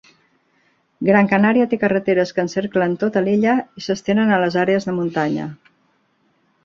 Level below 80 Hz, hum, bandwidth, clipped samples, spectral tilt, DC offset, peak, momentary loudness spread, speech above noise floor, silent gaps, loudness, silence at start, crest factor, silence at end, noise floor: -60 dBFS; none; 7.4 kHz; under 0.1%; -7 dB/octave; under 0.1%; -2 dBFS; 8 LU; 45 dB; none; -18 LUFS; 1 s; 16 dB; 1.1 s; -63 dBFS